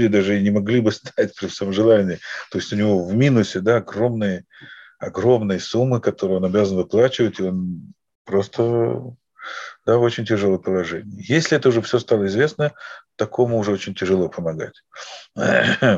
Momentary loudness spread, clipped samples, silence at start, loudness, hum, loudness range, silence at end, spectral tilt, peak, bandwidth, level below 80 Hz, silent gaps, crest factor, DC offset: 14 LU; under 0.1%; 0 s; -20 LUFS; none; 3 LU; 0 s; -6.5 dB/octave; -4 dBFS; 8 kHz; -60 dBFS; 8.15-8.25 s; 16 dB; under 0.1%